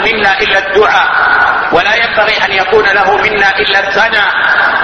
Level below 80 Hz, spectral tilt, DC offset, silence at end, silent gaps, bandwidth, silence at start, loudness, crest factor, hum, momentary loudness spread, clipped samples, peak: -38 dBFS; -3 dB/octave; under 0.1%; 0 s; none; 9.6 kHz; 0 s; -8 LUFS; 10 dB; none; 1 LU; 0.3%; 0 dBFS